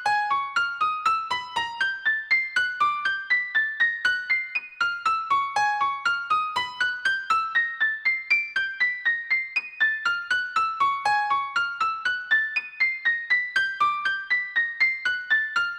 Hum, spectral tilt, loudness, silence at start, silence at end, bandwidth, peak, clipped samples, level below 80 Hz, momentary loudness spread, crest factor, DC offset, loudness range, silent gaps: none; 0 dB/octave; -23 LUFS; 0 s; 0 s; 20 kHz; -10 dBFS; under 0.1%; -70 dBFS; 4 LU; 14 dB; under 0.1%; 1 LU; none